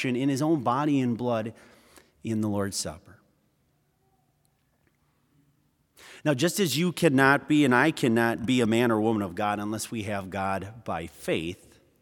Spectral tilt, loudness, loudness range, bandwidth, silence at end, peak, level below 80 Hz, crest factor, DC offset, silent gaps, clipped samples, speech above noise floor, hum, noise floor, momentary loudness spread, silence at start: -5 dB/octave; -26 LUFS; 12 LU; 18 kHz; 0.45 s; -4 dBFS; -64 dBFS; 22 dB; under 0.1%; none; under 0.1%; 44 dB; none; -70 dBFS; 12 LU; 0 s